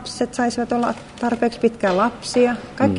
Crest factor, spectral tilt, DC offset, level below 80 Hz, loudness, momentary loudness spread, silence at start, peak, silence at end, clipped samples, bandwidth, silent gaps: 16 dB; -5 dB/octave; under 0.1%; -52 dBFS; -21 LUFS; 6 LU; 0 s; -4 dBFS; 0 s; under 0.1%; 11 kHz; none